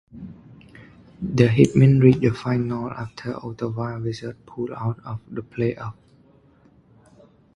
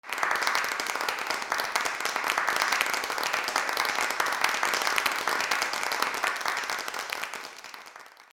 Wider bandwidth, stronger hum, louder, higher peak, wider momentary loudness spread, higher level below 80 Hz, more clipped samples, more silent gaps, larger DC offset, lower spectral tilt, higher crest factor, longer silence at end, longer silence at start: second, 8.8 kHz vs over 20 kHz; neither; first, -22 LUFS vs -27 LUFS; about the same, 0 dBFS vs -2 dBFS; first, 19 LU vs 8 LU; first, -52 dBFS vs -68 dBFS; neither; neither; neither; first, -8.5 dB/octave vs 0.5 dB/octave; second, 22 dB vs 28 dB; first, 1.65 s vs 0.1 s; about the same, 0.15 s vs 0.05 s